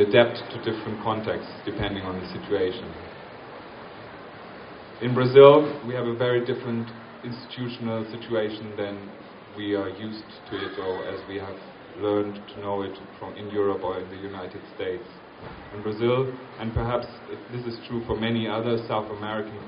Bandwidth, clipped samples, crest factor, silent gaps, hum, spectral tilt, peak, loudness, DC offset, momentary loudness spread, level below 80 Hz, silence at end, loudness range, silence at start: 5.4 kHz; under 0.1%; 24 dB; none; none; -5 dB/octave; -2 dBFS; -26 LUFS; under 0.1%; 17 LU; -52 dBFS; 0 s; 11 LU; 0 s